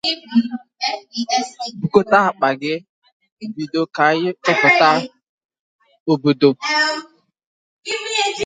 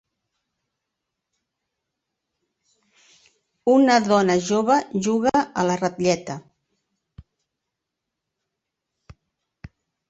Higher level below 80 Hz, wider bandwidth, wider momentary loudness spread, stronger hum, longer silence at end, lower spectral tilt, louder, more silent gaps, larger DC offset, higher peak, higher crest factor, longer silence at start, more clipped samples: about the same, -64 dBFS vs -60 dBFS; first, 9.6 kHz vs 8.2 kHz; first, 15 LU vs 10 LU; neither; second, 0 s vs 3.7 s; about the same, -4 dB/octave vs -5 dB/octave; first, -17 LUFS vs -20 LUFS; first, 2.89-3.02 s, 3.12-3.20 s, 3.32-3.37 s, 5.23-5.38 s, 5.45-5.49 s, 5.59-5.79 s, 6.00-6.06 s, 7.47-7.83 s vs none; neither; first, 0 dBFS vs -4 dBFS; about the same, 18 dB vs 22 dB; second, 0.05 s vs 3.65 s; neither